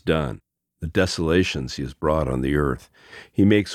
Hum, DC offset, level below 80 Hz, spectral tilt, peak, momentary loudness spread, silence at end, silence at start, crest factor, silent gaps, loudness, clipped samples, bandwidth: none; under 0.1%; -38 dBFS; -6 dB/octave; -4 dBFS; 12 LU; 0 s; 0.05 s; 18 dB; none; -23 LUFS; under 0.1%; 14.5 kHz